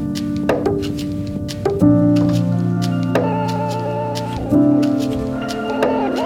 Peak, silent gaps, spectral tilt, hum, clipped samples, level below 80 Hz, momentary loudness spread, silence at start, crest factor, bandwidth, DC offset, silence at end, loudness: 0 dBFS; none; -7.5 dB/octave; none; under 0.1%; -40 dBFS; 9 LU; 0 s; 16 dB; 15.5 kHz; under 0.1%; 0 s; -18 LUFS